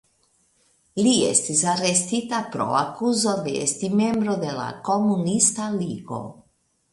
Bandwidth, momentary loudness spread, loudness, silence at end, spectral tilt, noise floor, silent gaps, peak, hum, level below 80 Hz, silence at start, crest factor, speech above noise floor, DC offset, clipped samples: 11.5 kHz; 11 LU; -22 LUFS; 0.6 s; -3.5 dB/octave; -66 dBFS; none; -4 dBFS; none; -62 dBFS; 0.95 s; 20 dB; 44 dB; under 0.1%; under 0.1%